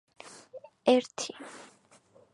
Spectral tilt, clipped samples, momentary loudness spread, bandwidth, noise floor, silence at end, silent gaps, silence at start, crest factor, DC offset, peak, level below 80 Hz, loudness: -3 dB/octave; under 0.1%; 24 LU; 11.5 kHz; -61 dBFS; 0.75 s; none; 0.55 s; 24 dB; under 0.1%; -10 dBFS; -84 dBFS; -29 LUFS